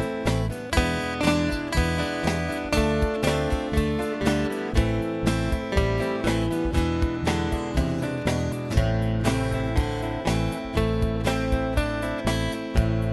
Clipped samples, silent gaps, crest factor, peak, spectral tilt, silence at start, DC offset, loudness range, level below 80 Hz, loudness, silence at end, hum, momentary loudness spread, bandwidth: under 0.1%; none; 18 dB; -6 dBFS; -6 dB/octave; 0 s; under 0.1%; 1 LU; -30 dBFS; -25 LUFS; 0 s; none; 3 LU; 12 kHz